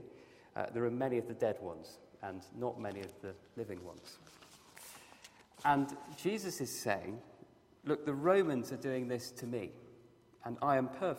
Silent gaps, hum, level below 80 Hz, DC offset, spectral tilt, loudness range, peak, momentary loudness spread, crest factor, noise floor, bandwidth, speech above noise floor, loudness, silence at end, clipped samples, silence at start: none; none; -76 dBFS; under 0.1%; -5.5 dB/octave; 10 LU; -16 dBFS; 22 LU; 22 dB; -63 dBFS; 16 kHz; 25 dB; -37 LUFS; 0 s; under 0.1%; 0 s